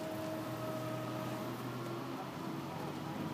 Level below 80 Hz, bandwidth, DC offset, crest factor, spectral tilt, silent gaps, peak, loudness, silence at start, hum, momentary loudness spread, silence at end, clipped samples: -72 dBFS; 15.5 kHz; under 0.1%; 12 dB; -6 dB/octave; none; -28 dBFS; -42 LUFS; 0 s; none; 2 LU; 0 s; under 0.1%